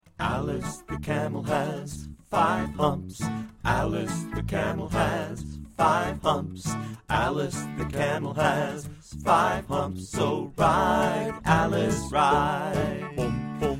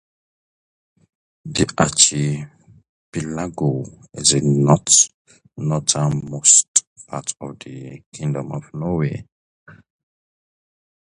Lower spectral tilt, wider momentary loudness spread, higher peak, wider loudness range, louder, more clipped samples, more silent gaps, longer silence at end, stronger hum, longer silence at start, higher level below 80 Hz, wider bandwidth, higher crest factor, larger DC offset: first, -5.5 dB/octave vs -3.5 dB/octave; second, 10 LU vs 21 LU; second, -6 dBFS vs 0 dBFS; second, 4 LU vs 13 LU; second, -27 LUFS vs -17 LUFS; neither; second, none vs 2.89-3.12 s, 5.14-5.25 s, 6.68-6.74 s, 6.87-6.96 s, 8.06-8.12 s, 9.32-9.66 s; second, 0 s vs 1.45 s; neither; second, 0.2 s vs 1.45 s; first, -44 dBFS vs -50 dBFS; first, 16 kHz vs 11.5 kHz; about the same, 20 dB vs 22 dB; neither